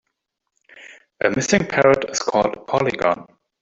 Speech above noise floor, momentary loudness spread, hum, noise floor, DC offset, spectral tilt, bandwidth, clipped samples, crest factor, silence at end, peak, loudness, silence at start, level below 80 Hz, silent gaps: 58 dB; 6 LU; none; -77 dBFS; under 0.1%; -4 dB/octave; 8 kHz; under 0.1%; 18 dB; 0.4 s; -2 dBFS; -19 LUFS; 0.75 s; -52 dBFS; none